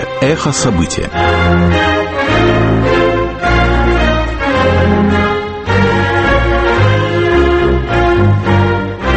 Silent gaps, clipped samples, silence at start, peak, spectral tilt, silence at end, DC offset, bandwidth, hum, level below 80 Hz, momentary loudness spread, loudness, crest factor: none; under 0.1%; 0 s; 0 dBFS; -6 dB/octave; 0 s; under 0.1%; 8.8 kHz; none; -20 dBFS; 4 LU; -12 LUFS; 10 dB